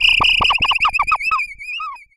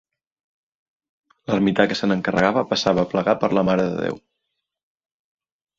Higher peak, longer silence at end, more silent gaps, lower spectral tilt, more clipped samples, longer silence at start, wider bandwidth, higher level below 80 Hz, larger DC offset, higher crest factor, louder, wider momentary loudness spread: about the same, -4 dBFS vs -2 dBFS; second, 0.2 s vs 1.6 s; neither; second, -1.5 dB/octave vs -6 dB/octave; neither; second, 0 s vs 1.5 s; first, 15.5 kHz vs 7.6 kHz; first, -38 dBFS vs -54 dBFS; neither; second, 14 dB vs 22 dB; first, -14 LUFS vs -20 LUFS; first, 14 LU vs 8 LU